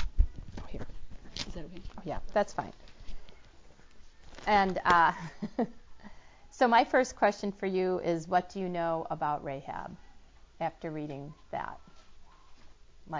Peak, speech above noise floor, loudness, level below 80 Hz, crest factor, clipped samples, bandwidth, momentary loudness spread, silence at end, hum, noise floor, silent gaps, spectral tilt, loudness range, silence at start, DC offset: -10 dBFS; 23 dB; -31 LUFS; -44 dBFS; 22 dB; under 0.1%; 7.6 kHz; 21 LU; 0 s; none; -53 dBFS; none; -5.5 dB/octave; 10 LU; 0 s; under 0.1%